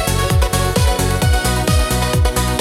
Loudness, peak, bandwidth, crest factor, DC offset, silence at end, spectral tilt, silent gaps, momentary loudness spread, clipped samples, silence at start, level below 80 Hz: -16 LUFS; -2 dBFS; 17 kHz; 14 dB; under 0.1%; 0 s; -4.5 dB/octave; none; 1 LU; under 0.1%; 0 s; -20 dBFS